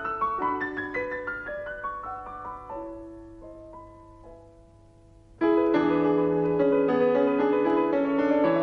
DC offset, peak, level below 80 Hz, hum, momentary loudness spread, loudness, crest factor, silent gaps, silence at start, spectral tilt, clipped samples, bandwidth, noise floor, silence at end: under 0.1%; -12 dBFS; -56 dBFS; none; 21 LU; -25 LUFS; 14 dB; none; 0 s; -8.5 dB/octave; under 0.1%; 6 kHz; -53 dBFS; 0 s